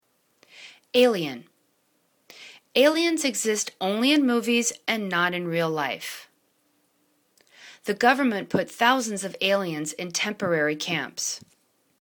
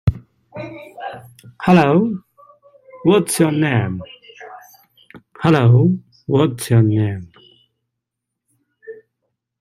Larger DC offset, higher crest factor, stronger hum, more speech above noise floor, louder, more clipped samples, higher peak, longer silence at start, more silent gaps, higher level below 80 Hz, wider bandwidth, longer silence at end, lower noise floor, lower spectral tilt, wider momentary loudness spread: neither; about the same, 22 dB vs 18 dB; neither; second, 45 dB vs 65 dB; second, -24 LUFS vs -16 LUFS; neither; about the same, -4 dBFS vs -2 dBFS; first, 0.55 s vs 0.05 s; neither; second, -72 dBFS vs -46 dBFS; first, 19 kHz vs 15.5 kHz; about the same, 0.6 s vs 0.7 s; second, -69 dBFS vs -80 dBFS; second, -3 dB/octave vs -6.5 dB/octave; second, 13 LU vs 26 LU